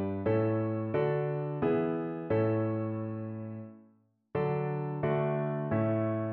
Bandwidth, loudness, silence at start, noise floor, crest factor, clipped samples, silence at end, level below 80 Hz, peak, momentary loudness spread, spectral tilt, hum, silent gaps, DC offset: 4.3 kHz; -32 LUFS; 0 s; -66 dBFS; 14 dB; under 0.1%; 0 s; -64 dBFS; -16 dBFS; 9 LU; -8.5 dB/octave; none; none; under 0.1%